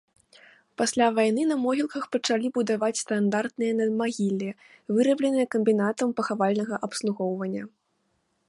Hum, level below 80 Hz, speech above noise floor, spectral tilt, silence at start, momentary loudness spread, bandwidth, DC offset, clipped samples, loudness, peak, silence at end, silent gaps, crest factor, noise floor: none; -74 dBFS; 48 dB; -5 dB/octave; 0.8 s; 8 LU; 11.5 kHz; under 0.1%; under 0.1%; -26 LUFS; -10 dBFS; 0.8 s; none; 16 dB; -73 dBFS